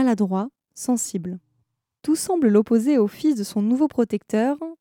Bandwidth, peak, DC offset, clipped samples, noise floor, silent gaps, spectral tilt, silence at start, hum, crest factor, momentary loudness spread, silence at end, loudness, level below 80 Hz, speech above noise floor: 17 kHz; -6 dBFS; under 0.1%; under 0.1%; -72 dBFS; none; -6 dB/octave; 0 s; none; 14 dB; 13 LU; 0.05 s; -22 LUFS; -66 dBFS; 51 dB